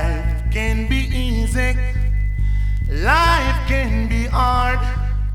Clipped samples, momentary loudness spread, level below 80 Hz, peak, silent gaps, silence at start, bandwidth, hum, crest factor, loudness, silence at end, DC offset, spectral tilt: under 0.1%; 6 LU; -20 dBFS; -2 dBFS; none; 0 s; 13 kHz; none; 16 dB; -19 LUFS; 0 s; under 0.1%; -5.5 dB/octave